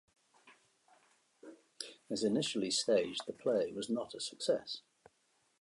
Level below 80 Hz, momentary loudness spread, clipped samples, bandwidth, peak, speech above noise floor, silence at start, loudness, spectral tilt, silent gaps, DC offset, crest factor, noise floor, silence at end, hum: -80 dBFS; 15 LU; under 0.1%; 11.5 kHz; -20 dBFS; 41 dB; 0.45 s; -36 LUFS; -3.5 dB/octave; none; under 0.1%; 18 dB; -76 dBFS; 0.8 s; none